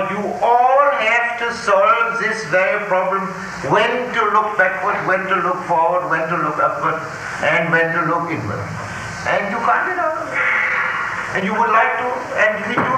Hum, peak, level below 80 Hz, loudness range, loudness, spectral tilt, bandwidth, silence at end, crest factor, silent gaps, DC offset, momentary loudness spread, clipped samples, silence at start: none; -2 dBFS; -52 dBFS; 3 LU; -17 LUFS; -5 dB/octave; 15 kHz; 0 s; 16 dB; none; under 0.1%; 8 LU; under 0.1%; 0 s